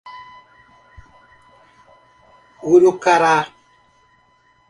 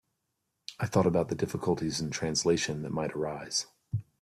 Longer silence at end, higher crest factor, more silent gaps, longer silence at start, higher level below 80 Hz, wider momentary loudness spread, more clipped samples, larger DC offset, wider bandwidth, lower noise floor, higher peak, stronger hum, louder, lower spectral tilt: first, 1.25 s vs 0.2 s; about the same, 20 dB vs 20 dB; neither; second, 0.05 s vs 0.7 s; about the same, -58 dBFS vs -60 dBFS; first, 23 LU vs 11 LU; neither; neither; second, 11 kHz vs 14 kHz; second, -57 dBFS vs -81 dBFS; first, 0 dBFS vs -12 dBFS; first, 60 Hz at -60 dBFS vs none; first, -15 LUFS vs -31 LUFS; about the same, -5 dB/octave vs -4.5 dB/octave